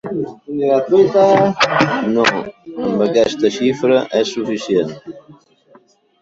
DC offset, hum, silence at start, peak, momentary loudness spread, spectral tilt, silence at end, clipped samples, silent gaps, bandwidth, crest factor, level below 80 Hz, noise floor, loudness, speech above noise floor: under 0.1%; none; 0.05 s; 0 dBFS; 13 LU; -5 dB/octave; 0.9 s; under 0.1%; none; 7.8 kHz; 16 dB; -56 dBFS; -50 dBFS; -15 LUFS; 35 dB